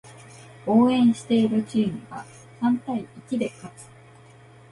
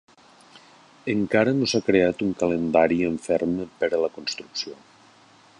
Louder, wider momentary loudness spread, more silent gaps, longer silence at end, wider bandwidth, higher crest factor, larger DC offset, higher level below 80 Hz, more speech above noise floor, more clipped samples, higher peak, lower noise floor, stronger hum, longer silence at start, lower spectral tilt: about the same, -23 LUFS vs -23 LUFS; first, 22 LU vs 11 LU; neither; about the same, 0.9 s vs 0.85 s; about the same, 11.5 kHz vs 11 kHz; about the same, 16 dB vs 20 dB; neither; second, -62 dBFS vs -56 dBFS; second, 27 dB vs 31 dB; neither; second, -8 dBFS vs -4 dBFS; second, -49 dBFS vs -54 dBFS; neither; second, 0.05 s vs 1.05 s; about the same, -6.5 dB/octave vs -5.5 dB/octave